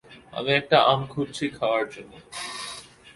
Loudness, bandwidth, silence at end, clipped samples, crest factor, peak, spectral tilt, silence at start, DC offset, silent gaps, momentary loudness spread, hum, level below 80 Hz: -24 LUFS; 11.5 kHz; 0.05 s; under 0.1%; 22 dB; -4 dBFS; -4.5 dB/octave; 0.1 s; under 0.1%; none; 19 LU; none; -60 dBFS